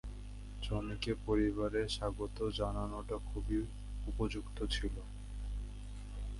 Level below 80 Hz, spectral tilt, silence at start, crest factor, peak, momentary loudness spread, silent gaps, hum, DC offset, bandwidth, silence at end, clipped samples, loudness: -42 dBFS; -6 dB/octave; 0.05 s; 16 dB; -22 dBFS; 13 LU; none; 50 Hz at -45 dBFS; under 0.1%; 11.5 kHz; 0 s; under 0.1%; -39 LUFS